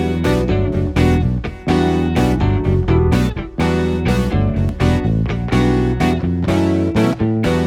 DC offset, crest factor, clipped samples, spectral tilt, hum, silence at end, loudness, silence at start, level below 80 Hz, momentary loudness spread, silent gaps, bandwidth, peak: under 0.1%; 14 dB; under 0.1%; -7.5 dB/octave; none; 0 s; -17 LUFS; 0 s; -24 dBFS; 3 LU; none; 15 kHz; -2 dBFS